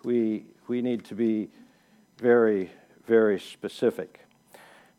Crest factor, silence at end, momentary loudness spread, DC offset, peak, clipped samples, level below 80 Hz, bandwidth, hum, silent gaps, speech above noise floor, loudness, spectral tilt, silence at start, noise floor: 18 dB; 0.9 s; 17 LU; under 0.1%; -8 dBFS; under 0.1%; -80 dBFS; 13.5 kHz; none; none; 36 dB; -26 LUFS; -7 dB/octave; 0.05 s; -61 dBFS